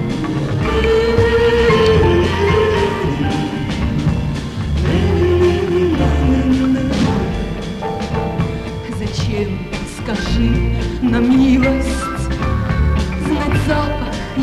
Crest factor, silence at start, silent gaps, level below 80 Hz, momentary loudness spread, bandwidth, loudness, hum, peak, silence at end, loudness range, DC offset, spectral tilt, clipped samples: 14 dB; 0 s; none; -24 dBFS; 10 LU; 13 kHz; -16 LUFS; none; 0 dBFS; 0 s; 6 LU; under 0.1%; -7 dB/octave; under 0.1%